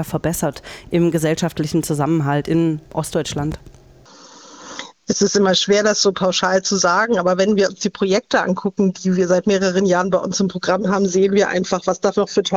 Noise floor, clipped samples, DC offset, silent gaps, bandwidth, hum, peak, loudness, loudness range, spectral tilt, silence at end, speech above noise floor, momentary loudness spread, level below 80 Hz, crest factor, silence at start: -45 dBFS; under 0.1%; under 0.1%; none; 16.5 kHz; none; -2 dBFS; -18 LUFS; 5 LU; -4.5 dB/octave; 0 s; 28 dB; 8 LU; -48 dBFS; 16 dB; 0 s